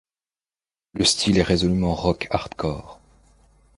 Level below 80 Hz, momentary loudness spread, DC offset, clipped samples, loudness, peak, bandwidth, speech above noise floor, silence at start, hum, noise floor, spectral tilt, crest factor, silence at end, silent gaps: -40 dBFS; 10 LU; under 0.1%; under 0.1%; -21 LUFS; -2 dBFS; 11.5 kHz; over 69 dB; 0.95 s; none; under -90 dBFS; -4.5 dB/octave; 22 dB; 0.85 s; none